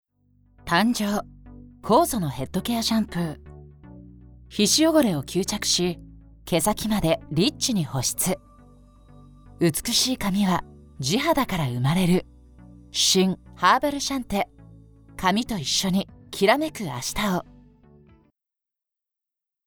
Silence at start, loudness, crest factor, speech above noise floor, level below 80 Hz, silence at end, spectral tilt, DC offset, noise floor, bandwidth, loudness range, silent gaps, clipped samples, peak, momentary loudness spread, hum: 0.65 s; -23 LUFS; 20 dB; 65 dB; -48 dBFS; 2.25 s; -4 dB/octave; under 0.1%; -88 dBFS; over 20 kHz; 3 LU; none; under 0.1%; -6 dBFS; 10 LU; none